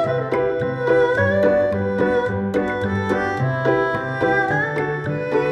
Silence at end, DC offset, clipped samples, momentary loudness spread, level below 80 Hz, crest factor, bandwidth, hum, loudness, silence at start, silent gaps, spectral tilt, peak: 0 s; under 0.1%; under 0.1%; 5 LU; -50 dBFS; 14 dB; 10 kHz; none; -20 LUFS; 0 s; none; -7.5 dB/octave; -6 dBFS